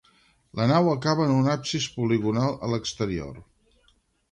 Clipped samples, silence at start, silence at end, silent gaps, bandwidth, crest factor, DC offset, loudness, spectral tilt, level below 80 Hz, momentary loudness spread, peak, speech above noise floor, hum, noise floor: under 0.1%; 0.55 s; 0.9 s; none; 10.5 kHz; 18 dB; under 0.1%; -25 LUFS; -6 dB/octave; -54 dBFS; 8 LU; -8 dBFS; 41 dB; none; -65 dBFS